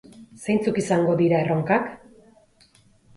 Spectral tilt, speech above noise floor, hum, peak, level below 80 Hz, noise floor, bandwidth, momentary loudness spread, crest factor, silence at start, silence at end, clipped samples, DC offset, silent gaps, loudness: -7 dB/octave; 36 dB; none; -6 dBFS; -62 dBFS; -57 dBFS; 11.5 kHz; 8 LU; 18 dB; 0.2 s; 1.2 s; under 0.1%; under 0.1%; none; -22 LUFS